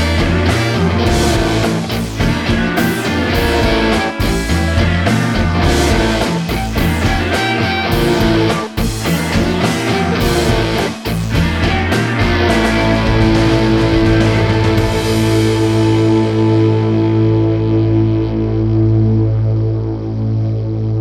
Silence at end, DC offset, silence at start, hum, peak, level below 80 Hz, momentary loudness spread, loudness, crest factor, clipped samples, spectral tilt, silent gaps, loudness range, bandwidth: 0 s; under 0.1%; 0 s; none; 0 dBFS; -24 dBFS; 5 LU; -14 LUFS; 12 dB; under 0.1%; -6 dB/octave; none; 2 LU; 18.5 kHz